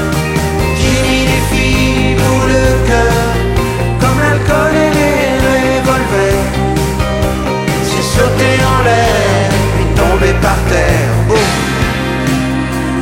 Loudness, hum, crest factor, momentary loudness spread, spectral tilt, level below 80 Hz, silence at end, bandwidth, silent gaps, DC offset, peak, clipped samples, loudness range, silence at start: -11 LUFS; none; 10 dB; 4 LU; -5.5 dB/octave; -20 dBFS; 0 s; 16.5 kHz; none; under 0.1%; 0 dBFS; under 0.1%; 1 LU; 0 s